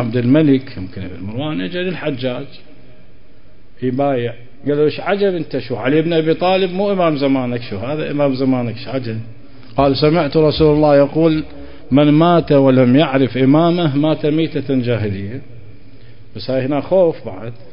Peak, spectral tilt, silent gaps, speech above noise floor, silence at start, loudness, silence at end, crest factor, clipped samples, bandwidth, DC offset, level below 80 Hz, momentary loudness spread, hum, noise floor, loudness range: 0 dBFS; -12.5 dB/octave; none; 32 dB; 0 s; -15 LUFS; 0.1 s; 14 dB; under 0.1%; 5.4 kHz; 3%; -42 dBFS; 15 LU; none; -47 dBFS; 9 LU